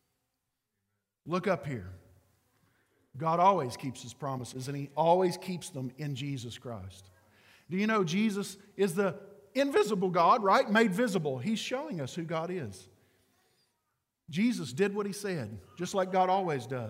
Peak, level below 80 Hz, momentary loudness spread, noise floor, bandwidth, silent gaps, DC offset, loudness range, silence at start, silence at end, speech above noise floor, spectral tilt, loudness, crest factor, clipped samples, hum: -12 dBFS; -74 dBFS; 15 LU; -84 dBFS; 16 kHz; none; under 0.1%; 8 LU; 1.25 s; 0 s; 53 dB; -5.5 dB/octave; -31 LUFS; 20 dB; under 0.1%; none